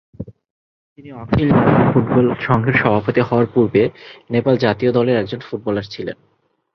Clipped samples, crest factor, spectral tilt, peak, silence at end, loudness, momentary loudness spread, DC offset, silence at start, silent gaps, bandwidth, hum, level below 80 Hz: under 0.1%; 16 dB; -9 dB/octave; 0 dBFS; 0.6 s; -16 LUFS; 19 LU; under 0.1%; 0.2 s; 0.50-0.96 s; 6.2 kHz; none; -42 dBFS